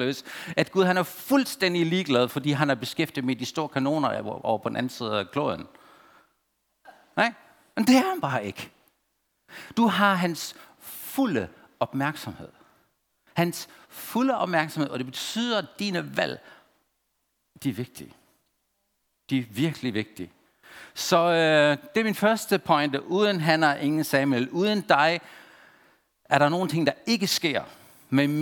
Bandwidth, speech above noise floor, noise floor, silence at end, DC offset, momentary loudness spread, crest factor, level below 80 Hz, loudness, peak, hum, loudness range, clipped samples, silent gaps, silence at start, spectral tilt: 19.5 kHz; 50 dB; -75 dBFS; 0 s; under 0.1%; 16 LU; 24 dB; -70 dBFS; -25 LUFS; -2 dBFS; none; 9 LU; under 0.1%; none; 0 s; -5 dB/octave